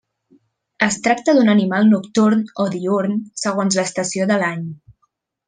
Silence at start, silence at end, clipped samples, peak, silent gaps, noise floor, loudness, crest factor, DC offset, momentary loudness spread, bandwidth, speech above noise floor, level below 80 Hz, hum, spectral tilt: 0.8 s; 0.75 s; under 0.1%; -2 dBFS; none; -68 dBFS; -17 LUFS; 16 dB; under 0.1%; 8 LU; 9.8 kHz; 51 dB; -64 dBFS; none; -5 dB/octave